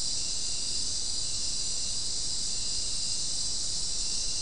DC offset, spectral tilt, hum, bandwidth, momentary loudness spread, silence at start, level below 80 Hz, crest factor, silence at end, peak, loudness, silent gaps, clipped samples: 2%; 0 dB/octave; none; 12 kHz; 1 LU; 0 s; -46 dBFS; 12 dB; 0 s; -18 dBFS; -29 LUFS; none; under 0.1%